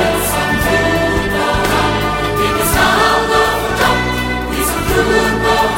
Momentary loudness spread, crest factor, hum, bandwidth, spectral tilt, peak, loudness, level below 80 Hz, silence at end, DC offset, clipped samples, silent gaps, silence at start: 5 LU; 14 dB; none; 16.5 kHz; -4 dB/octave; 0 dBFS; -14 LUFS; -26 dBFS; 0 s; under 0.1%; under 0.1%; none; 0 s